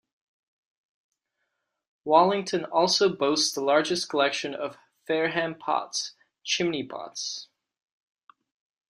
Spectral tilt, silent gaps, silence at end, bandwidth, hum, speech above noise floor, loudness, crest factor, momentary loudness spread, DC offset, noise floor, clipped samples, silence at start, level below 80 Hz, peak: -3 dB/octave; none; 1.45 s; 14 kHz; none; 55 dB; -25 LUFS; 22 dB; 14 LU; under 0.1%; -80 dBFS; under 0.1%; 2.05 s; -74 dBFS; -6 dBFS